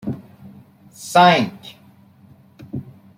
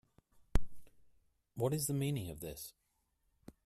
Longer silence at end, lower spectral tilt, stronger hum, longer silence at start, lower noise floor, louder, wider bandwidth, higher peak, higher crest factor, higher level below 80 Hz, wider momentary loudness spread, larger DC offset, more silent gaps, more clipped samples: second, 0.35 s vs 0.95 s; about the same, -5 dB/octave vs -5.5 dB/octave; neither; second, 0.05 s vs 0.55 s; second, -49 dBFS vs -80 dBFS; first, -16 LUFS vs -39 LUFS; about the same, 16 kHz vs 15.5 kHz; first, -2 dBFS vs -14 dBFS; about the same, 20 dB vs 24 dB; second, -62 dBFS vs -46 dBFS; first, 25 LU vs 14 LU; neither; neither; neither